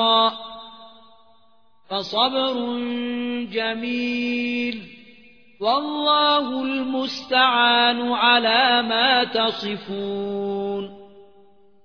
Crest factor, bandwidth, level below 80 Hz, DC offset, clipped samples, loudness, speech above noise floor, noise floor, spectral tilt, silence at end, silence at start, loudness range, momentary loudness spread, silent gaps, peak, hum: 18 dB; 5.4 kHz; -66 dBFS; 0.2%; under 0.1%; -20 LUFS; 40 dB; -61 dBFS; -4.5 dB/octave; 0.65 s; 0 s; 7 LU; 12 LU; none; -4 dBFS; none